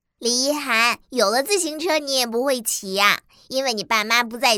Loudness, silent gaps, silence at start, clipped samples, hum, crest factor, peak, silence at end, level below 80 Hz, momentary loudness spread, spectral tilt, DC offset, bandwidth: -20 LUFS; none; 0.2 s; under 0.1%; none; 20 dB; -2 dBFS; 0 s; -66 dBFS; 5 LU; -1 dB/octave; under 0.1%; 19.5 kHz